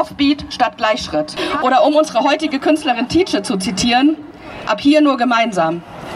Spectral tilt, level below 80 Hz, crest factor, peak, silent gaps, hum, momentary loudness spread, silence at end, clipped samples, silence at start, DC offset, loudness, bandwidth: -4 dB/octave; -46 dBFS; 14 dB; -2 dBFS; none; none; 8 LU; 0 s; under 0.1%; 0 s; under 0.1%; -15 LUFS; 12.5 kHz